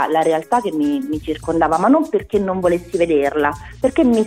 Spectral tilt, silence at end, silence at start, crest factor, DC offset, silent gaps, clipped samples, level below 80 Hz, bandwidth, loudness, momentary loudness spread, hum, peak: -6 dB/octave; 0 s; 0 s; 14 dB; under 0.1%; none; under 0.1%; -42 dBFS; 15.5 kHz; -18 LUFS; 7 LU; none; -2 dBFS